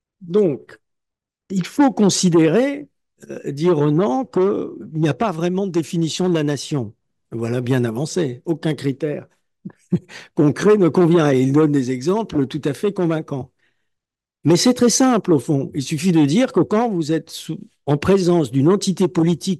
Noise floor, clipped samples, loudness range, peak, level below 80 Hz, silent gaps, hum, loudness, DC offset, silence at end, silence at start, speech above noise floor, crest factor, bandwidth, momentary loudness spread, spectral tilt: -83 dBFS; under 0.1%; 5 LU; -4 dBFS; -58 dBFS; none; none; -18 LUFS; under 0.1%; 0 s; 0.2 s; 65 dB; 16 dB; 12.5 kHz; 13 LU; -6 dB/octave